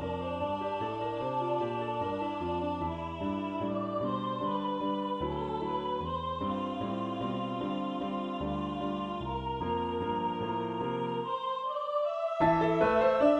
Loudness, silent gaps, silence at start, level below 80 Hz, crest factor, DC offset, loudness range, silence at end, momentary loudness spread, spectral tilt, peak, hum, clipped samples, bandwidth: -33 LUFS; none; 0 s; -54 dBFS; 18 dB; under 0.1%; 3 LU; 0 s; 8 LU; -8 dB/octave; -14 dBFS; none; under 0.1%; 9 kHz